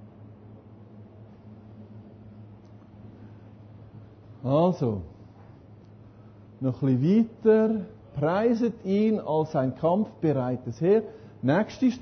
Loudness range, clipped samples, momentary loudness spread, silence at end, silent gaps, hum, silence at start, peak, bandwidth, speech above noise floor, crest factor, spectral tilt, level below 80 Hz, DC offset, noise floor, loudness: 7 LU; under 0.1%; 25 LU; 0 s; none; none; 0 s; -10 dBFS; 6.4 kHz; 25 dB; 18 dB; -9 dB/octave; -58 dBFS; under 0.1%; -49 dBFS; -25 LUFS